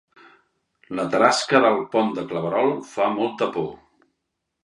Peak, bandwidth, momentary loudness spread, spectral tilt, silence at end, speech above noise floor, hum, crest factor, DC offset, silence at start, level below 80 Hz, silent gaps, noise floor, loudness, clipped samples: 0 dBFS; 11.5 kHz; 11 LU; -4.5 dB/octave; 0.9 s; 58 dB; none; 22 dB; under 0.1%; 0.9 s; -66 dBFS; none; -79 dBFS; -21 LUFS; under 0.1%